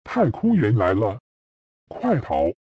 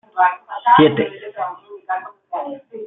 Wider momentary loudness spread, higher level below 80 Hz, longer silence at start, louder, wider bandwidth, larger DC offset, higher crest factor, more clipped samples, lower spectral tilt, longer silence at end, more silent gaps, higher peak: second, 11 LU vs 17 LU; first, -48 dBFS vs -60 dBFS; about the same, 0.05 s vs 0.15 s; second, -21 LUFS vs -18 LUFS; first, 7.4 kHz vs 4 kHz; neither; about the same, 14 dB vs 18 dB; neither; about the same, -9.5 dB/octave vs -10 dB/octave; first, 0.15 s vs 0 s; first, 1.20-1.87 s vs none; second, -8 dBFS vs -2 dBFS